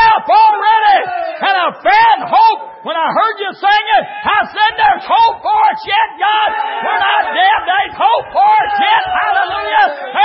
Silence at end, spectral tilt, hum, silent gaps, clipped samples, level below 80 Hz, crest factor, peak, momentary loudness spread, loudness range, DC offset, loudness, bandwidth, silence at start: 0 s; -6 dB/octave; none; none; under 0.1%; -50 dBFS; 12 dB; 0 dBFS; 6 LU; 1 LU; under 0.1%; -12 LUFS; 5.8 kHz; 0 s